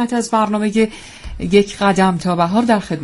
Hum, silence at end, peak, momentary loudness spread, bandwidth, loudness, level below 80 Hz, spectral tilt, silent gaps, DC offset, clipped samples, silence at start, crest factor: none; 0 s; 0 dBFS; 9 LU; 11.5 kHz; -16 LUFS; -38 dBFS; -5.5 dB/octave; none; under 0.1%; under 0.1%; 0 s; 16 dB